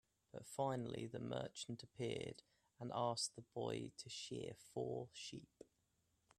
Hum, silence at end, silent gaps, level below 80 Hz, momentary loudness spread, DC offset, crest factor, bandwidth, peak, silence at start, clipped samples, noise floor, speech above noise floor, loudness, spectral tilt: none; 0.75 s; none; -80 dBFS; 15 LU; under 0.1%; 20 dB; 14 kHz; -28 dBFS; 0.35 s; under 0.1%; -83 dBFS; 36 dB; -47 LUFS; -4.5 dB/octave